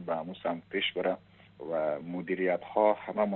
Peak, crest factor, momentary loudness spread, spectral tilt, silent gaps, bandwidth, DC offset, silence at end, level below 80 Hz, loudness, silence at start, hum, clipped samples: -12 dBFS; 20 dB; 9 LU; -3 dB/octave; none; 4.2 kHz; under 0.1%; 0 s; -74 dBFS; -31 LUFS; 0 s; none; under 0.1%